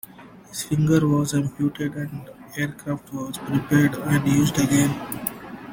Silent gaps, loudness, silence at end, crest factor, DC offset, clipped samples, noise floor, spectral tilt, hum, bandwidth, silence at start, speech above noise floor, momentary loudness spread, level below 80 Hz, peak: none; -23 LUFS; 0 s; 18 dB; under 0.1%; under 0.1%; -45 dBFS; -5.5 dB/octave; none; 17 kHz; 0.2 s; 23 dB; 14 LU; -52 dBFS; -6 dBFS